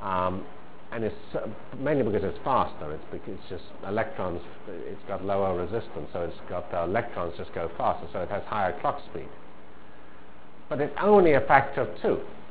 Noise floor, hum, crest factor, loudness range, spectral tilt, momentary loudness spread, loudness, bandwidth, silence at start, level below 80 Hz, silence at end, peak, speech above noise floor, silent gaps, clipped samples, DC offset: -51 dBFS; none; 24 dB; 7 LU; -10 dB/octave; 18 LU; -28 LUFS; 4 kHz; 0 s; -52 dBFS; 0 s; -4 dBFS; 23 dB; none; under 0.1%; 2%